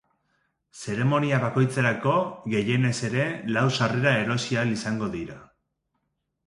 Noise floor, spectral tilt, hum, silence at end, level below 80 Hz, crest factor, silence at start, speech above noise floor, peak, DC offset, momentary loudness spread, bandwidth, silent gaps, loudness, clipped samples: -77 dBFS; -6 dB/octave; none; 1.05 s; -60 dBFS; 20 dB; 0.75 s; 53 dB; -6 dBFS; under 0.1%; 8 LU; 11.5 kHz; none; -25 LUFS; under 0.1%